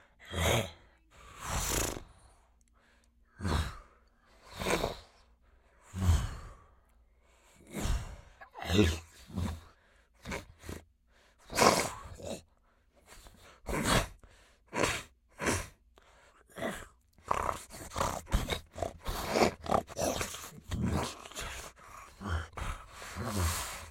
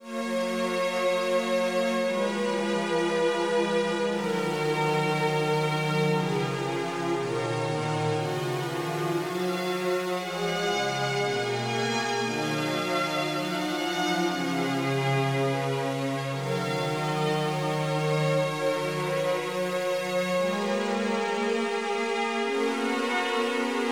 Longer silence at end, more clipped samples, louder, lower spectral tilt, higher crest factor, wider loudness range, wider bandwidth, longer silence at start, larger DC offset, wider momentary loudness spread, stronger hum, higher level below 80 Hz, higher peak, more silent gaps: about the same, 0 s vs 0 s; neither; second, -34 LUFS vs -27 LUFS; about the same, -4 dB/octave vs -5 dB/octave; first, 30 dB vs 14 dB; first, 5 LU vs 2 LU; second, 16.5 kHz vs over 20 kHz; first, 0.2 s vs 0 s; neither; first, 20 LU vs 3 LU; neither; first, -46 dBFS vs -76 dBFS; first, -6 dBFS vs -14 dBFS; neither